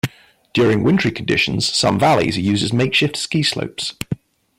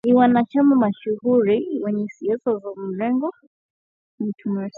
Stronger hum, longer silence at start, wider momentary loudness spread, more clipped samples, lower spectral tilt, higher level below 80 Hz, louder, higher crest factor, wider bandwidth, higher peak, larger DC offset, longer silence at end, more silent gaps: neither; about the same, 0.05 s vs 0.05 s; about the same, 10 LU vs 12 LU; neither; second, -4.5 dB/octave vs -9 dB/octave; first, -48 dBFS vs -70 dBFS; first, -17 LUFS vs -21 LUFS; second, 12 dB vs 18 dB; first, 16.5 kHz vs 4.9 kHz; about the same, -6 dBFS vs -4 dBFS; neither; first, 0.45 s vs 0 s; second, none vs 3.47-4.18 s